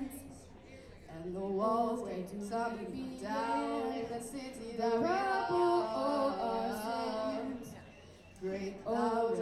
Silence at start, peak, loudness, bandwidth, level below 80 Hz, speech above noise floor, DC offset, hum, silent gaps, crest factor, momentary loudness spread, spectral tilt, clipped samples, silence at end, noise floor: 0 s; -20 dBFS; -35 LUFS; 15 kHz; -62 dBFS; 21 dB; under 0.1%; none; none; 16 dB; 21 LU; -5.5 dB/octave; under 0.1%; 0 s; -55 dBFS